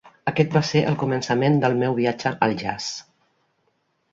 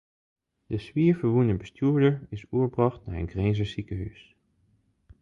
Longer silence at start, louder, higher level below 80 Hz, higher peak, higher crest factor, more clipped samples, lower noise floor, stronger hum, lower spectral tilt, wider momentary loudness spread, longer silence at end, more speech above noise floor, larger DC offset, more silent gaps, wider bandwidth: second, 0.05 s vs 0.7 s; first, -22 LUFS vs -27 LUFS; second, -58 dBFS vs -46 dBFS; first, -4 dBFS vs -8 dBFS; about the same, 20 dB vs 18 dB; neither; about the same, -69 dBFS vs -67 dBFS; neither; second, -6 dB/octave vs -9 dB/octave; second, 8 LU vs 12 LU; about the same, 1.1 s vs 1.1 s; first, 48 dB vs 42 dB; neither; neither; about the same, 7.8 kHz vs 7.4 kHz